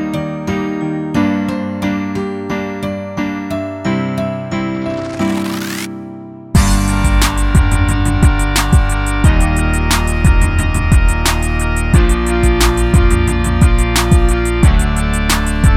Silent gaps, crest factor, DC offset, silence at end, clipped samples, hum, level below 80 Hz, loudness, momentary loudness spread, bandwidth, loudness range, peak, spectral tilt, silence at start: none; 12 dB; under 0.1%; 0 s; under 0.1%; none; -16 dBFS; -15 LUFS; 8 LU; 16.5 kHz; 6 LU; 0 dBFS; -5.5 dB/octave; 0 s